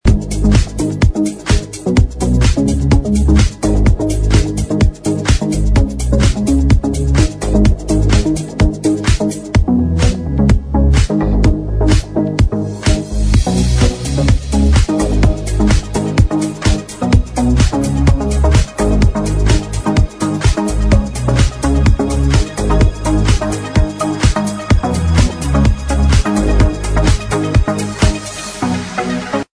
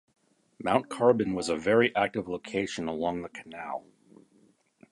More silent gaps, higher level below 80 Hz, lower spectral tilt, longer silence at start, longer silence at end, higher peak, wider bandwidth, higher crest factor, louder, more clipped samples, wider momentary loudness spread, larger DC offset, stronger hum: neither; first, -16 dBFS vs -62 dBFS; about the same, -6 dB/octave vs -5 dB/octave; second, 0.05 s vs 0.6 s; second, 0.15 s vs 1.1 s; first, 0 dBFS vs -6 dBFS; about the same, 11 kHz vs 11.5 kHz; second, 12 dB vs 24 dB; first, -14 LUFS vs -28 LUFS; neither; second, 4 LU vs 14 LU; neither; neither